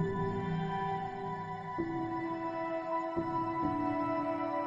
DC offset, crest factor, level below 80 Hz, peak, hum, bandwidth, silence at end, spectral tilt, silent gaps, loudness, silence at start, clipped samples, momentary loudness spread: under 0.1%; 12 dB; -60 dBFS; -22 dBFS; none; 7.6 kHz; 0 s; -8.5 dB/octave; none; -35 LUFS; 0 s; under 0.1%; 5 LU